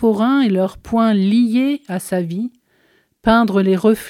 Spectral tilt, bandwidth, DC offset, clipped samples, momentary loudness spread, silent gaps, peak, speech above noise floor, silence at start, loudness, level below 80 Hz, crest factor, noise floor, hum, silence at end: -7 dB/octave; 15.5 kHz; under 0.1%; under 0.1%; 9 LU; none; -2 dBFS; 43 dB; 0 s; -16 LUFS; -46 dBFS; 14 dB; -58 dBFS; none; 0 s